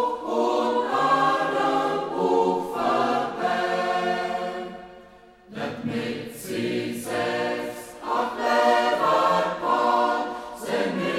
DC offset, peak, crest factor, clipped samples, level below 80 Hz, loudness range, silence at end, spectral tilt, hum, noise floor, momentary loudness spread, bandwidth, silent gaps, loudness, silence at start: under 0.1%; -8 dBFS; 16 dB; under 0.1%; -62 dBFS; 7 LU; 0 s; -4.5 dB/octave; none; -50 dBFS; 12 LU; 16 kHz; none; -24 LUFS; 0 s